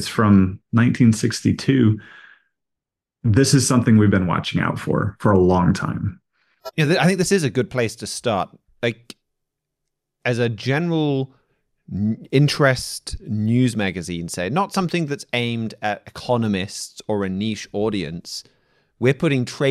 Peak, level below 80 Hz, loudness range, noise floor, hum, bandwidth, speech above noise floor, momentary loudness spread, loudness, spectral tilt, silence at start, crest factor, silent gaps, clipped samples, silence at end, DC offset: -4 dBFS; -50 dBFS; 7 LU; -84 dBFS; none; 14 kHz; 65 dB; 12 LU; -20 LUFS; -5.5 dB/octave; 0 s; 16 dB; none; under 0.1%; 0 s; under 0.1%